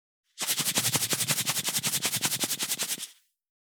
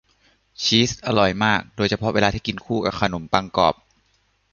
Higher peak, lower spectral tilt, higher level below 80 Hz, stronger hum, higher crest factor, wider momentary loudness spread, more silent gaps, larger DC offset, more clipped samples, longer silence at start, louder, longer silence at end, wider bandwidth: second, -8 dBFS vs 0 dBFS; second, -1 dB/octave vs -4.5 dB/octave; second, -84 dBFS vs -46 dBFS; neither; about the same, 22 dB vs 22 dB; about the same, 7 LU vs 6 LU; neither; neither; neither; second, 0.35 s vs 0.6 s; second, -27 LUFS vs -21 LUFS; second, 0.55 s vs 0.8 s; first, over 20 kHz vs 7.4 kHz